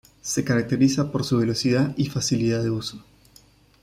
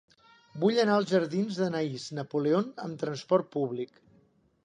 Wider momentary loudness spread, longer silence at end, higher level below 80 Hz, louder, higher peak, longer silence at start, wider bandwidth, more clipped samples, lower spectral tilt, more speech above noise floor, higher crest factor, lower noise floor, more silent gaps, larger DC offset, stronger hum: second, 6 LU vs 11 LU; about the same, 0.8 s vs 0.8 s; first, -54 dBFS vs -76 dBFS; first, -23 LUFS vs -29 LUFS; about the same, -8 dBFS vs -10 dBFS; second, 0.25 s vs 0.55 s; first, 15.5 kHz vs 10 kHz; neither; about the same, -5.5 dB/octave vs -6.5 dB/octave; second, 32 dB vs 37 dB; about the same, 16 dB vs 18 dB; second, -55 dBFS vs -65 dBFS; neither; neither; neither